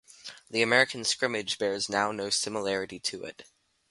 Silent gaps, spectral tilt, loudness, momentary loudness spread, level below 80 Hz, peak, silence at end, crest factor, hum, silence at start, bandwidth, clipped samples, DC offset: none; -2 dB/octave; -28 LUFS; 16 LU; -68 dBFS; -8 dBFS; 0.5 s; 22 dB; none; 0.25 s; 11.5 kHz; under 0.1%; under 0.1%